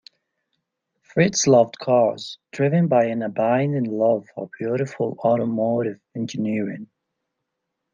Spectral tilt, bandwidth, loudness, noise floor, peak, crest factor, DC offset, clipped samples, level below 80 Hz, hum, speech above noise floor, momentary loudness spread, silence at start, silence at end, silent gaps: -5.5 dB/octave; 7.4 kHz; -21 LUFS; -80 dBFS; -4 dBFS; 18 dB; under 0.1%; under 0.1%; -66 dBFS; none; 59 dB; 12 LU; 1.15 s; 1.1 s; none